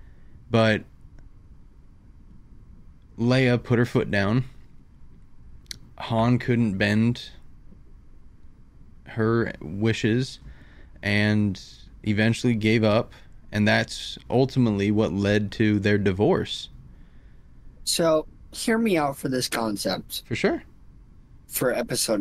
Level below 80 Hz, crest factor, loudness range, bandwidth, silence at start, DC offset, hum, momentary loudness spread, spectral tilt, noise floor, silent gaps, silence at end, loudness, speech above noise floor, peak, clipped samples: -48 dBFS; 18 dB; 5 LU; 15.5 kHz; 0.05 s; under 0.1%; none; 12 LU; -5.5 dB/octave; -49 dBFS; none; 0 s; -24 LUFS; 26 dB; -6 dBFS; under 0.1%